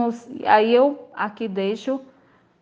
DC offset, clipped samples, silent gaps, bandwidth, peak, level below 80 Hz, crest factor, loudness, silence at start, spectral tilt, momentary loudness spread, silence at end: under 0.1%; under 0.1%; none; 7.6 kHz; -2 dBFS; -72 dBFS; 20 dB; -21 LUFS; 0 s; -6 dB/octave; 13 LU; 0.55 s